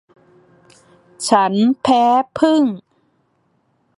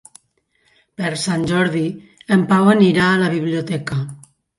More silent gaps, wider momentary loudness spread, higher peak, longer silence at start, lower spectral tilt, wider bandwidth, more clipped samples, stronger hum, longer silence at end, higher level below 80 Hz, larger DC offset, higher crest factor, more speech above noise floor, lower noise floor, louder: neither; second, 8 LU vs 13 LU; about the same, 0 dBFS vs -2 dBFS; first, 1.2 s vs 1 s; about the same, -5 dB/octave vs -6 dB/octave; about the same, 11.5 kHz vs 11.5 kHz; neither; neither; first, 1.2 s vs 0.45 s; second, -62 dBFS vs -54 dBFS; neither; about the same, 18 dB vs 16 dB; about the same, 48 dB vs 47 dB; about the same, -63 dBFS vs -64 dBFS; about the same, -15 LUFS vs -17 LUFS